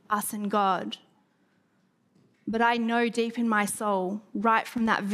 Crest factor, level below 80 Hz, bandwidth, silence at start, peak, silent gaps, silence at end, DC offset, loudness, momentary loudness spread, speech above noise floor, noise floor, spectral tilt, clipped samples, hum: 18 dB; -68 dBFS; 15.5 kHz; 0.1 s; -10 dBFS; none; 0 s; under 0.1%; -27 LUFS; 8 LU; 42 dB; -68 dBFS; -4 dB/octave; under 0.1%; none